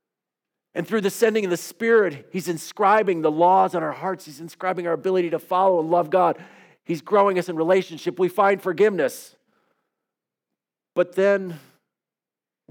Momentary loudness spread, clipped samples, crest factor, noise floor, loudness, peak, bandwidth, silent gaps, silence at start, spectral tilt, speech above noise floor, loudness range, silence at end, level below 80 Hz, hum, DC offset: 12 LU; under 0.1%; 18 dB; -90 dBFS; -21 LUFS; -6 dBFS; 19 kHz; none; 0.75 s; -5.5 dB/octave; 69 dB; 5 LU; 1.15 s; -82 dBFS; none; under 0.1%